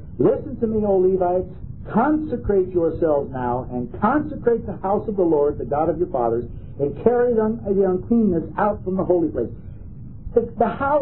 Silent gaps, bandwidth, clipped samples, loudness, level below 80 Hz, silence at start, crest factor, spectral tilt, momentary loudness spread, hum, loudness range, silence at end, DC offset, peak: none; 4 kHz; under 0.1%; -21 LUFS; -40 dBFS; 0 s; 18 dB; -13 dB/octave; 9 LU; none; 1 LU; 0 s; 0.9%; -2 dBFS